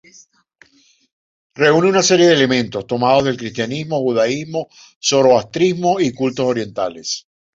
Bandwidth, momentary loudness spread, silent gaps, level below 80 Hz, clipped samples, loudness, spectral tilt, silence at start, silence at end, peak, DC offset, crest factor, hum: 7.8 kHz; 12 LU; 4.96-5.01 s; -56 dBFS; under 0.1%; -16 LUFS; -4 dB/octave; 1.6 s; 0.35 s; -2 dBFS; under 0.1%; 16 dB; none